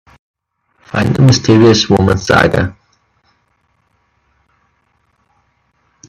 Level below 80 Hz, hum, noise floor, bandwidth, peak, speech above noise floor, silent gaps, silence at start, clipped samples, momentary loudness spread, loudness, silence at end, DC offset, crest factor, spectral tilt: -40 dBFS; none; -60 dBFS; 12.5 kHz; 0 dBFS; 51 dB; none; 0.95 s; under 0.1%; 9 LU; -11 LUFS; 3.35 s; under 0.1%; 14 dB; -5.5 dB/octave